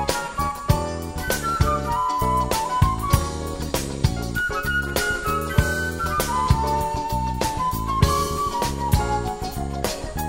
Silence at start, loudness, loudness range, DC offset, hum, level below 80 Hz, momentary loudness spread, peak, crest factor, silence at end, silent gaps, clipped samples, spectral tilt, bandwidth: 0 s; -23 LUFS; 1 LU; 0.2%; none; -30 dBFS; 6 LU; -2 dBFS; 20 dB; 0 s; none; under 0.1%; -4.5 dB/octave; 16.5 kHz